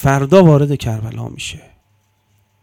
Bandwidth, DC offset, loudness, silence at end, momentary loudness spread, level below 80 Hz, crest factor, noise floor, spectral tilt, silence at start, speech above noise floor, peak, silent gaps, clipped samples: 16 kHz; under 0.1%; -13 LUFS; 1.05 s; 18 LU; -42 dBFS; 16 dB; -60 dBFS; -7 dB/octave; 0 s; 47 dB; 0 dBFS; none; 0.5%